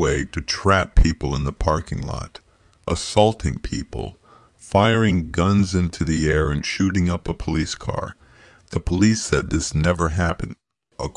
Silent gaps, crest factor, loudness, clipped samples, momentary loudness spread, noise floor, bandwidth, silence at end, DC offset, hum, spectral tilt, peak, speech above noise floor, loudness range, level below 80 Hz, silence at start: none; 18 dB; -21 LUFS; under 0.1%; 13 LU; -50 dBFS; 11 kHz; 0.05 s; under 0.1%; none; -5.5 dB/octave; -2 dBFS; 30 dB; 3 LU; -30 dBFS; 0 s